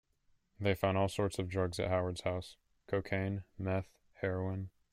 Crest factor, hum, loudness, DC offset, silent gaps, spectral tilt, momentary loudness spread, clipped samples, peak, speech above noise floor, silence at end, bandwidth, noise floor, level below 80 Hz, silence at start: 20 dB; none; -36 LUFS; under 0.1%; none; -6.5 dB/octave; 8 LU; under 0.1%; -16 dBFS; 38 dB; 0.25 s; 15 kHz; -73 dBFS; -62 dBFS; 0.6 s